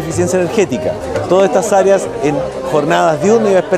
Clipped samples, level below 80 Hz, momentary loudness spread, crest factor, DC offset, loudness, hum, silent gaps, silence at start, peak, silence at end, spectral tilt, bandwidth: under 0.1%; -42 dBFS; 7 LU; 12 dB; under 0.1%; -13 LUFS; none; none; 0 s; 0 dBFS; 0 s; -5.5 dB/octave; 15 kHz